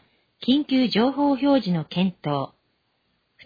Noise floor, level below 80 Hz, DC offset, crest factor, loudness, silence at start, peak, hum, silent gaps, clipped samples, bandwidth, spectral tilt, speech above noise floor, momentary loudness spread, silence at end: -70 dBFS; -62 dBFS; under 0.1%; 14 dB; -22 LUFS; 0.4 s; -10 dBFS; none; none; under 0.1%; 5 kHz; -8 dB/octave; 49 dB; 9 LU; 1 s